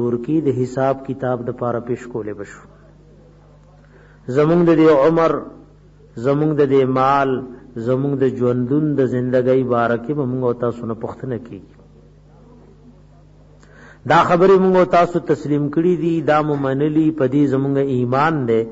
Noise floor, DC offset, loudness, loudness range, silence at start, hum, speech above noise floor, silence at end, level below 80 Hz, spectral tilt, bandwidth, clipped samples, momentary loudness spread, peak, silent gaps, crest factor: -46 dBFS; under 0.1%; -17 LUFS; 10 LU; 0 s; 50 Hz at -45 dBFS; 29 dB; 0 s; -50 dBFS; -8.5 dB/octave; 8 kHz; under 0.1%; 15 LU; -4 dBFS; none; 14 dB